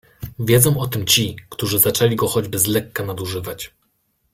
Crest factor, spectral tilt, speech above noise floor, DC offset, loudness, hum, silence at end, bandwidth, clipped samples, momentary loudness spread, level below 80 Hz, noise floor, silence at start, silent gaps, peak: 20 dB; -4 dB/octave; 48 dB; under 0.1%; -18 LUFS; none; 0.65 s; 16.5 kHz; under 0.1%; 14 LU; -48 dBFS; -67 dBFS; 0.2 s; none; 0 dBFS